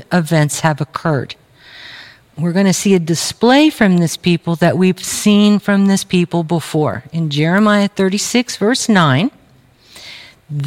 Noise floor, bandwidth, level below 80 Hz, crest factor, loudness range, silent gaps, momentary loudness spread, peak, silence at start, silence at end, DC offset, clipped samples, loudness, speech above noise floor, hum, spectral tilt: -49 dBFS; 16 kHz; -54 dBFS; 14 dB; 3 LU; none; 10 LU; 0 dBFS; 0 s; 0 s; under 0.1%; under 0.1%; -14 LUFS; 35 dB; none; -5 dB/octave